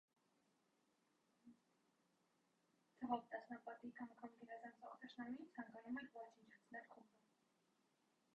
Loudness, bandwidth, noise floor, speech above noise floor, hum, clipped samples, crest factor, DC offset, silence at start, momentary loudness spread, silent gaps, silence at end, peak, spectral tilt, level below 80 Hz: -54 LUFS; 8 kHz; -84 dBFS; 32 dB; none; under 0.1%; 26 dB; under 0.1%; 1.45 s; 13 LU; none; 1.3 s; -30 dBFS; -3.5 dB/octave; under -90 dBFS